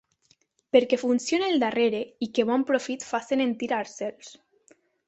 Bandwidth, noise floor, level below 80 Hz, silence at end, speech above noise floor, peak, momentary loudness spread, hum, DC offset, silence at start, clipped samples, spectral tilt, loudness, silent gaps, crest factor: 8.2 kHz; -66 dBFS; -72 dBFS; 0.75 s; 41 dB; -6 dBFS; 8 LU; none; under 0.1%; 0.75 s; under 0.1%; -3.5 dB/octave; -26 LUFS; none; 20 dB